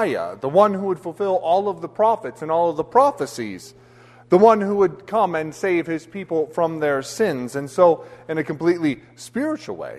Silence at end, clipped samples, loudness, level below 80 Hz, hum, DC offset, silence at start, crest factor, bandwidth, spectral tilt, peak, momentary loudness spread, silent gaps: 0 s; under 0.1%; -21 LUFS; -62 dBFS; none; under 0.1%; 0 s; 18 dB; 13.5 kHz; -6 dB/octave; -2 dBFS; 11 LU; none